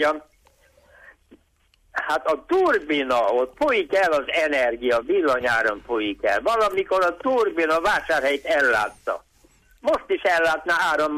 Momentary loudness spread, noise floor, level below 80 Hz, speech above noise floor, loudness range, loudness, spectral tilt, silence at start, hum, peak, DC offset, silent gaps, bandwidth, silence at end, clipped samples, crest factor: 6 LU; -62 dBFS; -54 dBFS; 41 dB; 2 LU; -21 LUFS; -3.5 dB/octave; 0 s; none; -10 dBFS; under 0.1%; none; 15.5 kHz; 0 s; under 0.1%; 12 dB